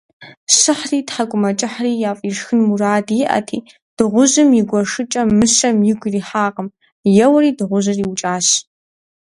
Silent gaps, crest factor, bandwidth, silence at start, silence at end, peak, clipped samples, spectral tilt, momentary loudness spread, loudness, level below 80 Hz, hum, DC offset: 0.37-0.47 s, 3.82-3.97 s, 6.92-7.04 s; 16 dB; 11.5 kHz; 0.2 s; 0.6 s; 0 dBFS; under 0.1%; -3.5 dB/octave; 9 LU; -15 LUFS; -54 dBFS; none; under 0.1%